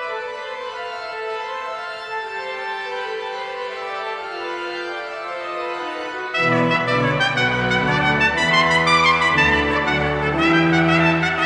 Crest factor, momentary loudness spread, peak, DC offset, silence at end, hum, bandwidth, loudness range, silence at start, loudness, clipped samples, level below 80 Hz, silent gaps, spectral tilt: 16 dB; 13 LU; -4 dBFS; under 0.1%; 0 s; none; 11 kHz; 11 LU; 0 s; -19 LUFS; under 0.1%; -42 dBFS; none; -5 dB/octave